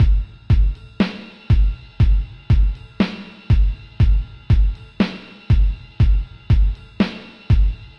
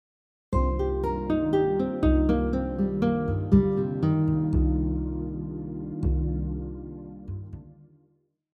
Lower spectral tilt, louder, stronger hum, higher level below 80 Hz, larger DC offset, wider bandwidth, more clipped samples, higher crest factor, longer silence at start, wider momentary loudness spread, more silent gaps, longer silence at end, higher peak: second, -8.5 dB/octave vs -10.5 dB/octave; first, -20 LUFS vs -26 LUFS; neither; first, -18 dBFS vs -32 dBFS; neither; first, 5.8 kHz vs 4.9 kHz; neither; second, 12 dB vs 20 dB; second, 0 s vs 0.5 s; second, 5 LU vs 16 LU; neither; second, 0.1 s vs 0.8 s; about the same, -6 dBFS vs -6 dBFS